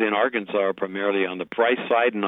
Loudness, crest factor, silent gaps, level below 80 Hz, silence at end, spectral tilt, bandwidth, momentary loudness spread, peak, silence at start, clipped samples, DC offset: -23 LUFS; 14 dB; none; -72 dBFS; 0 s; -8 dB/octave; 4 kHz; 5 LU; -10 dBFS; 0 s; under 0.1%; under 0.1%